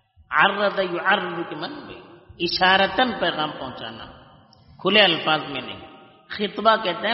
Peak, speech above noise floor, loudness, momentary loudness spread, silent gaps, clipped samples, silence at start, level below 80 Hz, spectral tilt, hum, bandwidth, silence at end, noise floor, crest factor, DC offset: -2 dBFS; 29 dB; -20 LUFS; 19 LU; none; under 0.1%; 0.3 s; -58 dBFS; -0.5 dB/octave; none; 5.8 kHz; 0 s; -51 dBFS; 22 dB; under 0.1%